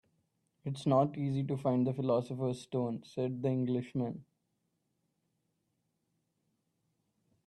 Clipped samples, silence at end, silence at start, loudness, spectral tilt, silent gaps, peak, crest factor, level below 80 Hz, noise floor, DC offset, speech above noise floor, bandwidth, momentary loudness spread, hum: under 0.1%; 3.25 s; 0.65 s; -34 LUFS; -8.5 dB/octave; none; -16 dBFS; 20 dB; -76 dBFS; -81 dBFS; under 0.1%; 48 dB; 10 kHz; 9 LU; none